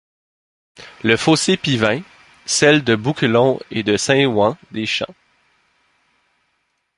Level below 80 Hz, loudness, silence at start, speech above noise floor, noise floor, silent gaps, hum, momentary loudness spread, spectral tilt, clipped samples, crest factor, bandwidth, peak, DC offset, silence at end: -54 dBFS; -17 LUFS; 0.8 s; 52 dB; -69 dBFS; none; none; 10 LU; -4 dB/octave; under 0.1%; 18 dB; 11.5 kHz; 0 dBFS; under 0.1%; 1.85 s